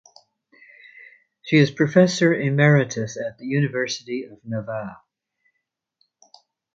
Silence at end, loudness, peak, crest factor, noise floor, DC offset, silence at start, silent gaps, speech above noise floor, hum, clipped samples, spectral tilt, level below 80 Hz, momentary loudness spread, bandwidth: 1.8 s; -21 LUFS; -2 dBFS; 20 dB; -79 dBFS; under 0.1%; 1.45 s; none; 59 dB; none; under 0.1%; -6 dB/octave; -64 dBFS; 15 LU; 7.8 kHz